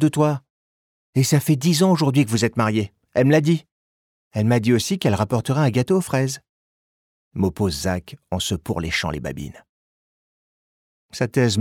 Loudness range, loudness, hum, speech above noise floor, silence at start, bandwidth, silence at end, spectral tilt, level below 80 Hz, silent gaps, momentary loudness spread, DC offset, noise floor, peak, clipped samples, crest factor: 7 LU; -21 LUFS; none; over 70 dB; 0 s; 17.5 kHz; 0 s; -5.5 dB/octave; -48 dBFS; 0.50-1.13 s, 3.72-4.31 s, 6.49-7.31 s, 9.69-11.09 s; 13 LU; under 0.1%; under -90 dBFS; -4 dBFS; under 0.1%; 16 dB